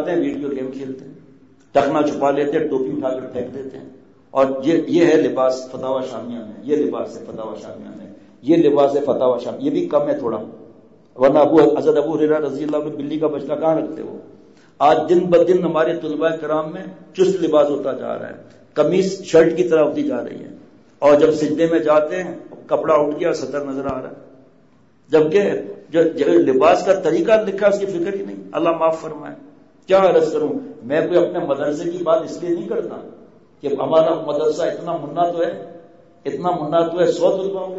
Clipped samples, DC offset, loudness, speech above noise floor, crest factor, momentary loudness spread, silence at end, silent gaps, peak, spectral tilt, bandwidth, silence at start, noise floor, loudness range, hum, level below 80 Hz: under 0.1%; 0.2%; -18 LUFS; 36 dB; 16 dB; 17 LU; 0 s; none; -4 dBFS; -6.5 dB/octave; 8 kHz; 0 s; -54 dBFS; 4 LU; none; -60 dBFS